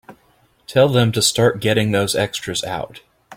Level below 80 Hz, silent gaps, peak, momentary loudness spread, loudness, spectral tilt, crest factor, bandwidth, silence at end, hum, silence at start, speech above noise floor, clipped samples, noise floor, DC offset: -50 dBFS; none; -2 dBFS; 10 LU; -18 LUFS; -4 dB/octave; 16 dB; 16.5 kHz; 0 s; none; 0.1 s; 40 dB; under 0.1%; -57 dBFS; under 0.1%